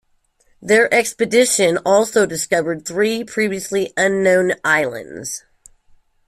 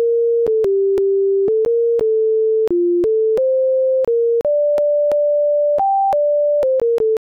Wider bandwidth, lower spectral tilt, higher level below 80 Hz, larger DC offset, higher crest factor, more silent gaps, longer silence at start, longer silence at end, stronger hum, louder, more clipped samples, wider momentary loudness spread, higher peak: first, 15.5 kHz vs 5.2 kHz; second, -3 dB/octave vs -7.5 dB/octave; about the same, -58 dBFS vs -54 dBFS; neither; first, 16 dB vs 4 dB; neither; first, 0.6 s vs 0 s; first, 0.9 s vs 0.1 s; neither; about the same, -17 LUFS vs -16 LUFS; neither; first, 14 LU vs 0 LU; first, -2 dBFS vs -12 dBFS